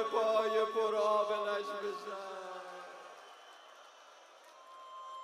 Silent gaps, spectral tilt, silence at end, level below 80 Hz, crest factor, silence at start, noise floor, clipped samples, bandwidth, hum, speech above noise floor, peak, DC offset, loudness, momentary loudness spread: none; -3 dB/octave; 0 s; -86 dBFS; 18 dB; 0 s; -58 dBFS; under 0.1%; 14 kHz; none; 24 dB; -20 dBFS; under 0.1%; -34 LUFS; 25 LU